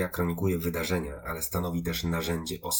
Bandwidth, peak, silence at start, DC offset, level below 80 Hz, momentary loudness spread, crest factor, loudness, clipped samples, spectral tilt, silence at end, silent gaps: over 20 kHz; -12 dBFS; 0 s; under 0.1%; -48 dBFS; 4 LU; 18 dB; -30 LUFS; under 0.1%; -4.5 dB/octave; 0 s; none